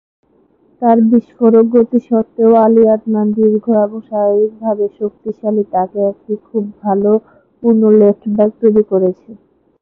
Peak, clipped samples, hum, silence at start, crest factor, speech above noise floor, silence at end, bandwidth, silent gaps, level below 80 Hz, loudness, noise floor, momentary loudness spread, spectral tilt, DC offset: 0 dBFS; under 0.1%; none; 0.8 s; 12 dB; 41 dB; 0.45 s; 2.6 kHz; none; -58 dBFS; -13 LUFS; -53 dBFS; 10 LU; -12.5 dB/octave; under 0.1%